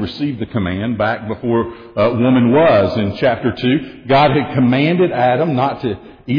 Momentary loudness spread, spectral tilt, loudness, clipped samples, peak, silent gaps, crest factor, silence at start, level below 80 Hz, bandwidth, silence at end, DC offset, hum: 9 LU; -9 dB/octave; -15 LUFS; under 0.1%; -2 dBFS; none; 12 dB; 0 s; -46 dBFS; 5.2 kHz; 0 s; under 0.1%; none